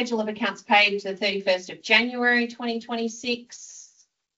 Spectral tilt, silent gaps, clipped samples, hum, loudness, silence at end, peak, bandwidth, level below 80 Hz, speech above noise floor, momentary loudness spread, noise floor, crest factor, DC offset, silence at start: -0.5 dB/octave; none; under 0.1%; none; -23 LUFS; 0.55 s; -4 dBFS; 8 kHz; -72 dBFS; 38 dB; 12 LU; -62 dBFS; 20 dB; under 0.1%; 0 s